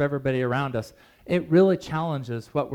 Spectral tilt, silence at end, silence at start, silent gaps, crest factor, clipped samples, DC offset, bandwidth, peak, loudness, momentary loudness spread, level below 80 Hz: -8 dB/octave; 0 s; 0 s; none; 16 dB; under 0.1%; under 0.1%; 13 kHz; -8 dBFS; -25 LUFS; 11 LU; -56 dBFS